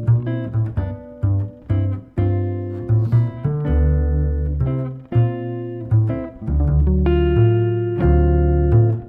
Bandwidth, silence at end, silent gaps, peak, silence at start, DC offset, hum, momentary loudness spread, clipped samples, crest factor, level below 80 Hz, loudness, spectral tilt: 3.3 kHz; 0 s; none; -4 dBFS; 0 s; under 0.1%; none; 9 LU; under 0.1%; 14 dB; -24 dBFS; -19 LUFS; -12 dB/octave